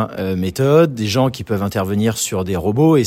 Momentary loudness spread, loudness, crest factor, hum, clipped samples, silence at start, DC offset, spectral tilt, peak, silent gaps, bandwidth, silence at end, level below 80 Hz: 7 LU; -17 LUFS; 16 dB; none; under 0.1%; 0 s; under 0.1%; -6 dB/octave; 0 dBFS; none; 16.5 kHz; 0 s; -46 dBFS